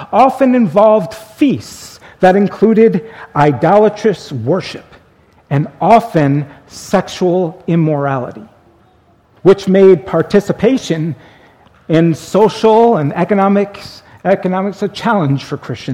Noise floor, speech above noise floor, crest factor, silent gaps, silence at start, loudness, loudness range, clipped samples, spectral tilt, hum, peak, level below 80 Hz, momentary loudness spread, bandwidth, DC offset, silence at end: -50 dBFS; 38 dB; 12 dB; none; 0 s; -12 LUFS; 3 LU; 0.2%; -7 dB/octave; none; 0 dBFS; -50 dBFS; 13 LU; 15.5 kHz; under 0.1%; 0 s